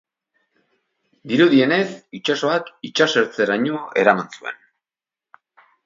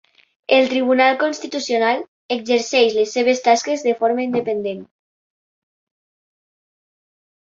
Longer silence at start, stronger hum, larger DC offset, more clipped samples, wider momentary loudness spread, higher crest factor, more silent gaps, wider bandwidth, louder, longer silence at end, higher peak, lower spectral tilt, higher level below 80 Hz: first, 1.25 s vs 0.5 s; neither; neither; neither; first, 14 LU vs 10 LU; about the same, 20 dB vs 18 dB; second, none vs 2.08-2.29 s; about the same, 7.6 kHz vs 7.8 kHz; about the same, -19 LUFS vs -18 LUFS; second, 1.3 s vs 2.65 s; about the same, 0 dBFS vs -2 dBFS; first, -5 dB/octave vs -3 dB/octave; about the same, -70 dBFS vs -68 dBFS